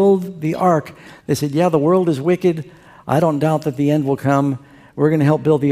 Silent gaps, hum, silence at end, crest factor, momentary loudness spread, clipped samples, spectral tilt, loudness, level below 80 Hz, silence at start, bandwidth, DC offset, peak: none; none; 0 s; 16 dB; 14 LU; under 0.1%; -7.5 dB/octave; -17 LUFS; -56 dBFS; 0 s; 15.5 kHz; under 0.1%; -2 dBFS